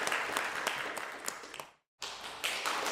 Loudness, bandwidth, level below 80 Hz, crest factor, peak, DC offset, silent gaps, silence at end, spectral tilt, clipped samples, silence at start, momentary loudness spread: -36 LUFS; 16 kHz; -74 dBFS; 26 dB; -10 dBFS; under 0.1%; 1.88-1.98 s; 0 s; 0 dB/octave; under 0.1%; 0 s; 13 LU